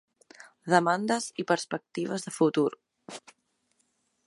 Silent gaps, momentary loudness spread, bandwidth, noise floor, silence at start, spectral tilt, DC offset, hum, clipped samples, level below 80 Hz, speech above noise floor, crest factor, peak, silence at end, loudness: none; 21 LU; 11.5 kHz; -74 dBFS; 0.65 s; -4.5 dB/octave; under 0.1%; none; under 0.1%; -80 dBFS; 46 dB; 24 dB; -6 dBFS; 1.05 s; -28 LUFS